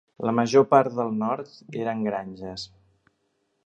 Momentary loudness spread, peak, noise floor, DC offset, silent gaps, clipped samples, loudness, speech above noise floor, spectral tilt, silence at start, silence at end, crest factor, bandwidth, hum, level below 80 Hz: 18 LU; -2 dBFS; -73 dBFS; under 0.1%; none; under 0.1%; -24 LUFS; 49 dB; -6 dB/octave; 0.2 s; 1 s; 22 dB; 8.4 kHz; none; -64 dBFS